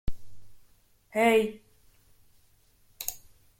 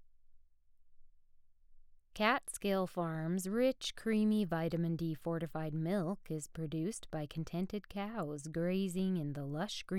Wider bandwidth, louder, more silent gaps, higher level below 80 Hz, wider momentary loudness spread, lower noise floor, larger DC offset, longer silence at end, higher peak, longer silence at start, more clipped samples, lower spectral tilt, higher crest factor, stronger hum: about the same, 17 kHz vs 16.5 kHz; first, -27 LUFS vs -37 LUFS; neither; first, -46 dBFS vs -62 dBFS; first, 19 LU vs 9 LU; about the same, -63 dBFS vs -63 dBFS; neither; first, 0.4 s vs 0 s; first, -10 dBFS vs -16 dBFS; about the same, 0.05 s vs 0 s; neither; second, -4 dB/octave vs -6 dB/octave; about the same, 20 dB vs 20 dB; neither